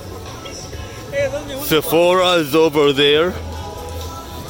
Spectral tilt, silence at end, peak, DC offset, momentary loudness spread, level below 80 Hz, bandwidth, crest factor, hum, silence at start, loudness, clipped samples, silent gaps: -4.5 dB/octave; 0 s; -4 dBFS; under 0.1%; 17 LU; -40 dBFS; 17 kHz; 14 dB; none; 0 s; -15 LUFS; under 0.1%; none